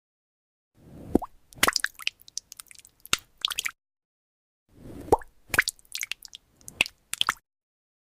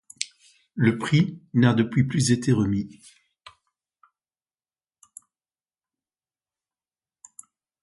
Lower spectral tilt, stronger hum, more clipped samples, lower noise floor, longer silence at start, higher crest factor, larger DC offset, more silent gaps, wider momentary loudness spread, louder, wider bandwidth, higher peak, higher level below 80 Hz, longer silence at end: second, -1.5 dB/octave vs -6 dB/octave; neither; neither; second, -52 dBFS vs under -90 dBFS; first, 0.9 s vs 0.2 s; about the same, 26 dB vs 24 dB; neither; first, 4.05-4.66 s vs none; first, 20 LU vs 13 LU; second, -28 LUFS vs -23 LUFS; first, 16 kHz vs 11.5 kHz; about the same, -6 dBFS vs -4 dBFS; about the same, -52 dBFS vs -56 dBFS; second, 0.7 s vs 4.95 s